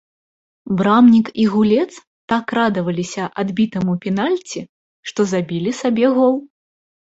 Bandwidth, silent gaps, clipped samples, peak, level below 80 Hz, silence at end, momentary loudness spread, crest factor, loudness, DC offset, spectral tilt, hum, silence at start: 8 kHz; 2.07-2.28 s, 4.69-5.03 s; under 0.1%; -2 dBFS; -58 dBFS; 0.65 s; 13 LU; 16 dB; -17 LUFS; under 0.1%; -6.5 dB/octave; none; 0.65 s